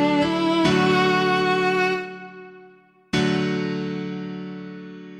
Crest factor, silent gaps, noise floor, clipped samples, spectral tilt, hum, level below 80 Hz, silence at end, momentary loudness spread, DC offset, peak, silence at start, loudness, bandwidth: 16 dB; none; -51 dBFS; under 0.1%; -5.5 dB/octave; none; -54 dBFS; 0 s; 18 LU; under 0.1%; -6 dBFS; 0 s; -21 LUFS; 13.5 kHz